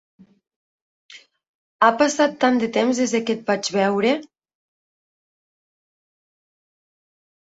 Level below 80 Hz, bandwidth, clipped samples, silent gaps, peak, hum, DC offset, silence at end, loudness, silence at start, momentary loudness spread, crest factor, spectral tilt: -70 dBFS; 8 kHz; under 0.1%; 1.48-1.79 s; -2 dBFS; none; under 0.1%; 3.35 s; -20 LUFS; 1.15 s; 5 LU; 22 dB; -4 dB/octave